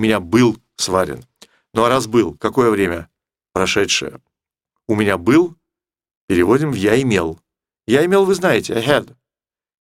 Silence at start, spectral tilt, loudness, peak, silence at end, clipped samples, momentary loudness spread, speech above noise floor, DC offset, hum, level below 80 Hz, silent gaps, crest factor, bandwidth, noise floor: 0 s; -5 dB/octave; -17 LUFS; 0 dBFS; 0.8 s; under 0.1%; 10 LU; over 74 dB; under 0.1%; none; -48 dBFS; 6.17-6.28 s; 18 dB; 16 kHz; under -90 dBFS